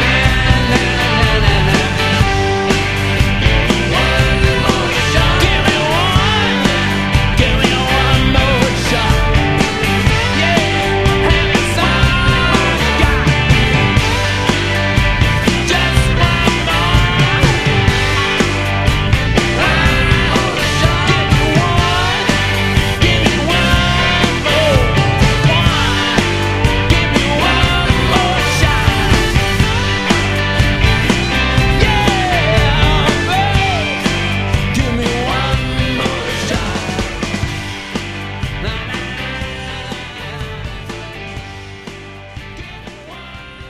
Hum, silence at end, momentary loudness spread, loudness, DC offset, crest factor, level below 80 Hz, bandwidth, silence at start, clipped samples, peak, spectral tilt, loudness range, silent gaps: none; 0 s; 11 LU; -13 LUFS; under 0.1%; 14 dB; -20 dBFS; 15.5 kHz; 0 s; under 0.1%; 0 dBFS; -5 dB/octave; 8 LU; none